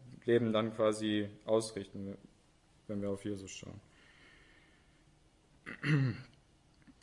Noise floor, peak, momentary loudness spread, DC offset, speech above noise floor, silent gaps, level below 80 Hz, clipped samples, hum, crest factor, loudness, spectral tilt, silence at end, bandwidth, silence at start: -67 dBFS; -18 dBFS; 20 LU; under 0.1%; 32 dB; none; -70 dBFS; under 0.1%; none; 20 dB; -35 LUFS; -6 dB/octave; 0.1 s; 11.5 kHz; 0 s